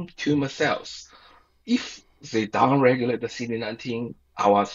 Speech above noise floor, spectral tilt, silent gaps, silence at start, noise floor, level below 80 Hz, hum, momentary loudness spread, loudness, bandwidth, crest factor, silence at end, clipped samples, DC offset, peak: 31 dB; -5.5 dB/octave; none; 0 s; -55 dBFS; -62 dBFS; none; 17 LU; -24 LUFS; 7.8 kHz; 20 dB; 0 s; under 0.1%; under 0.1%; -4 dBFS